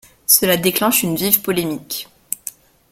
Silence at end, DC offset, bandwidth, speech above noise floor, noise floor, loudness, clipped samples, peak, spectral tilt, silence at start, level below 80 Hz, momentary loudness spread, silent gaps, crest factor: 0.4 s; under 0.1%; over 20 kHz; 20 dB; -37 dBFS; -15 LUFS; under 0.1%; 0 dBFS; -3 dB/octave; 0.3 s; -54 dBFS; 15 LU; none; 20 dB